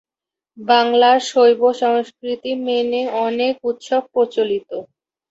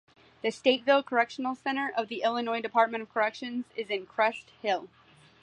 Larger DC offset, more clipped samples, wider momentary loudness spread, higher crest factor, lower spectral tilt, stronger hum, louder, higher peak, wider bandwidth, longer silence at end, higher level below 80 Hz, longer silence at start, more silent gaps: neither; neither; first, 12 LU vs 9 LU; about the same, 16 dB vs 20 dB; about the same, -3 dB/octave vs -3.5 dB/octave; neither; first, -17 LUFS vs -29 LUFS; first, -2 dBFS vs -10 dBFS; second, 8 kHz vs 10 kHz; about the same, 0.45 s vs 0.55 s; first, -68 dBFS vs -76 dBFS; about the same, 0.55 s vs 0.45 s; neither